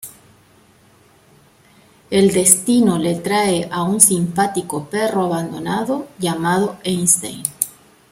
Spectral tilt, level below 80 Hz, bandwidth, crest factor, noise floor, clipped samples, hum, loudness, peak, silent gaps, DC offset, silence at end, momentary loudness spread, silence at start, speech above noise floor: -4 dB/octave; -56 dBFS; 16.5 kHz; 18 dB; -51 dBFS; under 0.1%; none; -17 LUFS; 0 dBFS; none; under 0.1%; 0.4 s; 12 LU; 0.05 s; 34 dB